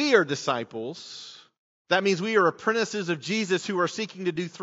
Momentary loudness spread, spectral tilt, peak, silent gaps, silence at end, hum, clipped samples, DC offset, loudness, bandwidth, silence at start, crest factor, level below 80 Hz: 14 LU; -3 dB/octave; -4 dBFS; 1.58-1.85 s; 0 s; none; under 0.1%; under 0.1%; -26 LUFS; 8 kHz; 0 s; 22 dB; -76 dBFS